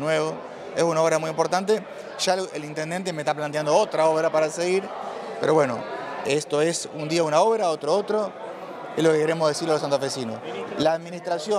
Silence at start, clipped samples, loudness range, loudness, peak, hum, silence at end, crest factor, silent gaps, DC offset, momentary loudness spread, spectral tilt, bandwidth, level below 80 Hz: 0 s; under 0.1%; 2 LU; -24 LUFS; -6 dBFS; none; 0 s; 16 dB; none; under 0.1%; 11 LU; -4.5 dB/octave; 14 kHz; -72 dBFS